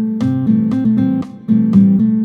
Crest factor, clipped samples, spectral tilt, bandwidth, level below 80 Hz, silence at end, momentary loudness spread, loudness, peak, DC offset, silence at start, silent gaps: 12 dB; under 0.1%; -10.5 dB/octave; 4.5 kHz; -50 dBFS; 0 s; 6 LU; -14 LUFS; 0 dBFS; under 0.1%; 0 s; none